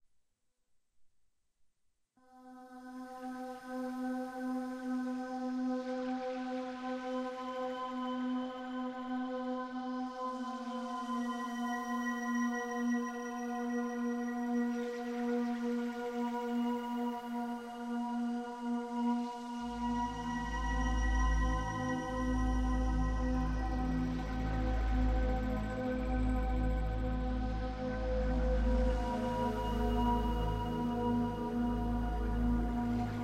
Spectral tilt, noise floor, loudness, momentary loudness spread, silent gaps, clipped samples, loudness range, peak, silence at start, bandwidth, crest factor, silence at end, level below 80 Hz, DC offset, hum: -7 dB/octave; -79 dBFS; -36 LUFS; 6 LU; none; under 0.1%; 5 LU; -22 dBFS; 1 s; 12 kHz; 14 dB; 0 s; -40 dBFS; under 0.1%; none